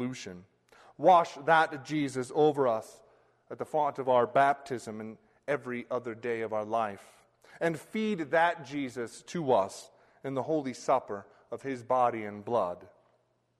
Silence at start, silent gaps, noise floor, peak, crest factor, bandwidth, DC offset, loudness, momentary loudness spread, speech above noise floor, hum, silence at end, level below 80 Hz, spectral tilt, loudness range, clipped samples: 0 s; none; -72 dBFS; -10 dBFS; 20 dB; 13 kHz; under 0.1%; -30 LUFS; 17 LU; 42 dB; none; 0.75 s; -76 dBFS; -5.5 dB/octave; 5 LU; under 0.1%